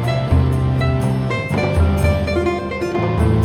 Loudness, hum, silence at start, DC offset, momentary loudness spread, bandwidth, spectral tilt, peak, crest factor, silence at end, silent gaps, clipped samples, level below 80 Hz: -18 LUFS; none; 0 s; under 0.1%; 4 LU; 16 kHz; -7.5 dB/octave; -4 dBFS; 12 dB; 0 s; none; under 0.1%; -26 dBFS